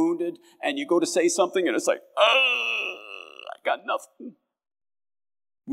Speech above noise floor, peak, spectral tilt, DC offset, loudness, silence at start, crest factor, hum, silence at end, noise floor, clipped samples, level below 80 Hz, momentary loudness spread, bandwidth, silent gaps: over 66 dB; -4 dBFS; -2 dB/octave; under 0.1%; -24 LUFS; 0 s; 22 dB; none; 0 s; under -90 dBFS; under 0.1%; under -90 dBFS; 20 LU; 15 kHz; none